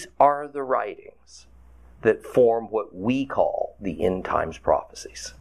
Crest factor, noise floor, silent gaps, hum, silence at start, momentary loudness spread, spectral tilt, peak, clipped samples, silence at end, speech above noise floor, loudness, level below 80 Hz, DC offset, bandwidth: 20 dB; -50 dBFS; none; none; 0 s; 13 LU; -5.5 dB/octave; -4 dBFS; under 0.1%; 0.1 s; 26 dB; -24 LUFS; -50 dBFS; 0.2%; 13 kHz